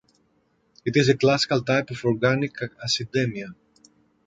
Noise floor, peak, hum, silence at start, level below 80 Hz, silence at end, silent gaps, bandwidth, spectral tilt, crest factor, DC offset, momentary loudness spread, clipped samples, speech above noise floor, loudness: -66 dBFS; -4 dBFS; none; 0.85 s; -60 dBFS; 0.75 s; none; 9.2 kHz; -5 dB/octave; 20 dB; under 0.1%; 12 LU; under 0.1%; 44 dB; -23 LUFS